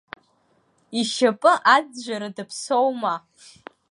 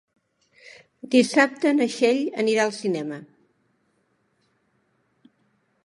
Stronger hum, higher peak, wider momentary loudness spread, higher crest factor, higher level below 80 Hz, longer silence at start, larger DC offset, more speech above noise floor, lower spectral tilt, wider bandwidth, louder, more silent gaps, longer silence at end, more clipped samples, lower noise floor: neither; about the same, -2 dBFS vs -4 dBFS; about the same, 15 LU vs 13 LU; about the same, 22 dB vs 22 dB; about the same, -74 dBFS vs -78 dBFS; first, 0.9 s vs 0.65 s; neither; second, 42 dB vs 47 dB; about the same, -3 dB/octave vs -4 dB/octave; about the same, 11.5 kHz vs 11.5 kHz; about the same, -21 LUFS vs -22 LUFS; neither; second, 0.75 s vs 2.6 s; neither; second, -64 dBFS vs -69 dBFS